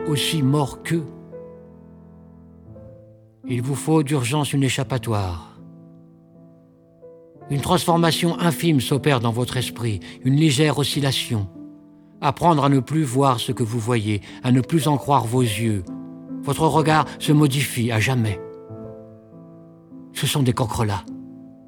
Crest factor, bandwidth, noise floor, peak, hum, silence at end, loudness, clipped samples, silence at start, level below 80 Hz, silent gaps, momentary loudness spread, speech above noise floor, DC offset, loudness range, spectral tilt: 20 dB; 19 kHz; -51 dBFS; -2 dBFS; none; 0.2 s; -21 LUFS; under 0.1%; 0 s; -50 dBFS; none; 18 LU; 31 dB; under 0.1%; 7 LU; -5.5 dB/octave